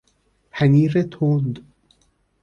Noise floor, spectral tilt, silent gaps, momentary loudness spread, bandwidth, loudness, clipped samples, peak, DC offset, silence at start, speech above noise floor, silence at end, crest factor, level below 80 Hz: -64 dBFS; -9 dB/octave; none; 17 LU; 6.4 kHz; -19 LUFS; under 0.1%; -4 dBFS; under 0.1%; 0.55 s; 46 dB; 0.8 s; 16 dB; -56 dBFS